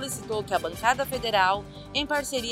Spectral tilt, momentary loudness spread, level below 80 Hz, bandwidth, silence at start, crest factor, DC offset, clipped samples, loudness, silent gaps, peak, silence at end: -2.5 dB/octave; 8 LU; -50 dBFS; 16 kHz; 0 s; 20 dB; under 0.1%; under 0.1%; -26 LUFS; none; -8 dBFS; 0 s